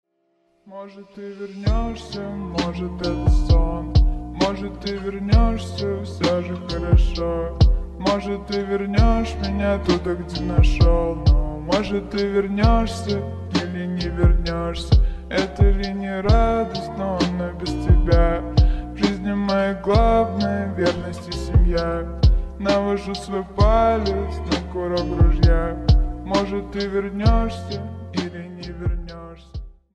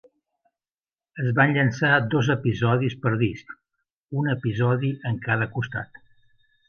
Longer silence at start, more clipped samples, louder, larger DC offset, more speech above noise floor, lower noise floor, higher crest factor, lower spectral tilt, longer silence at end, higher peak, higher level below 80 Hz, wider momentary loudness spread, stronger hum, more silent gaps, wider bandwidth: second, 0.65 s vs 1.15 s; neither; about the same, -21 LUFS vs -23 LUFS; neither; second, 47 dB vs over 67 dB; second, -66 dBFS vs under -90 dBFS; about the same, 18 dB vs 20 dB; about the same, -7 dB/octave vs -7.5 dB/octave; second, 0.2 s vs 0.85 s; about the same, -2 dBFS vs -4 dBFS; first, -22 dBFS vs -56 dBFS; about the same, 10 LU vs 12 LU; neither; second, none vs 3.93-4.07 s; first, 9.2 kHz vs 6.8 kHz